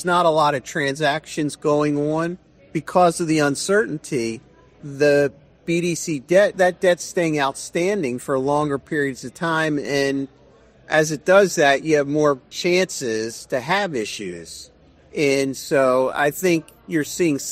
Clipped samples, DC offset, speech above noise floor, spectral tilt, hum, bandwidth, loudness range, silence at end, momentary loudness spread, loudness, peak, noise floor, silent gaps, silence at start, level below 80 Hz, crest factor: under 0.1%; under 0.1%; 31 dB; -4.5 dB/octave; none; 15.5 kHz; 3 LU; 0 s; 11 LU; -20 LUFS; -2 dBFS; -51 dBFS; none; 0 s; -58 dBFS; 18 dB